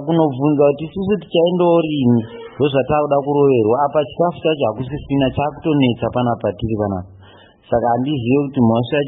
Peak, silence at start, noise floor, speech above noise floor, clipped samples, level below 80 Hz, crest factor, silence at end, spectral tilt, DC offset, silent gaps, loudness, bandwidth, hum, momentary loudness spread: -2 dBFS; 0 s; -45 dBFS; 29 dB; under 0.1%; -44 dBFS; 14 dB; 0 s; -12.5 dB/octave; under 0.1%; none; -17 LUFS; 4 kHz; none; 7 LU